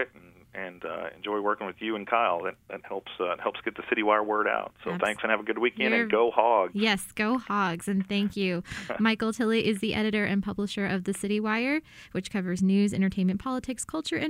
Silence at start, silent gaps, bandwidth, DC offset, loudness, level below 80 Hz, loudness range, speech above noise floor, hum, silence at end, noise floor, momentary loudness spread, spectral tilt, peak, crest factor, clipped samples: 0 s; none; 16 kHz; under 0.1%; -28 LUFS; -60 dBFS; 4 LU; 26 dB; none; 0 s; -54 dBFS; 11 LU; -5 dB/octave; -6 dBFS; 22 dB; under 0.1%